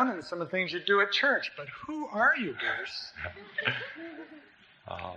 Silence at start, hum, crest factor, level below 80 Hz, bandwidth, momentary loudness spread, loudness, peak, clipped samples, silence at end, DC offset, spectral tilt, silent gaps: 0 s; none; 22 dB; -66 dBFS; 9 kHz; 17 LU; -29 LUFS; -8 dBFS; under 0.1%; 0 s; under 0.1%; -4.5 dB/octave; none